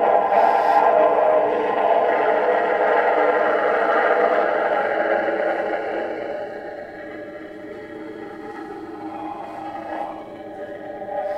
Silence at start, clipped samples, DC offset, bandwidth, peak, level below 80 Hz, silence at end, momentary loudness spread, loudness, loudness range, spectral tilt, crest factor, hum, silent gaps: 0 s; under 0.1%; under 0.1%; 8.8 kHz; -4 dBFS; -62 dBFS; 0 s; 18 LU; -19 LUFS; 15 LU; -5.5 dB/octave; 16 dB; none; none